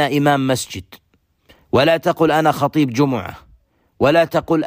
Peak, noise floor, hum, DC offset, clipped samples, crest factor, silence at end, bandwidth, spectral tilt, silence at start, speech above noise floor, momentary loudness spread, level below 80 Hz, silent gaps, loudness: -4 dBFS; -59 dBFS; none; under 0.1%; under 0.1%; 14 dB; 0 s; 15.5 kHz; -5.5 dB/octave; 0 s; 43 dB; 10 LU; -50 dBFS; none; -17 LUFS